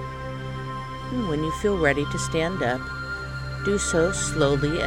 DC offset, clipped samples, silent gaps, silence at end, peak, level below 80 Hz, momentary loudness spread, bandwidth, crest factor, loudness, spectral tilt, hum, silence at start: under 0.1%; under 0.1%; none; 0 s; -6 dBFS; -38 dBFS; 11 LU; 16.5 kHz; 18 dB; -25 LUFS; -4.5 dB/octave; none; 0 s